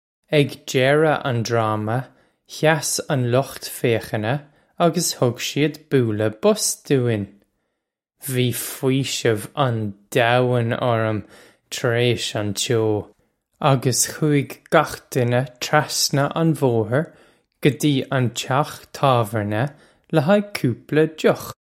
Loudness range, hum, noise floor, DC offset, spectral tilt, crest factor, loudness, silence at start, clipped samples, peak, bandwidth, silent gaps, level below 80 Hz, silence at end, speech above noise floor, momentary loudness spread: 2 LU; none; -79 dBFS; under 0.1%; -5 dB/octave; 20 dB; -21 LUFS; 0.3 s; under 0.1%; 0 dBFS; 16.5 kHz; none; -58 dBFS; 0.1 s; 59 dB; 7 LU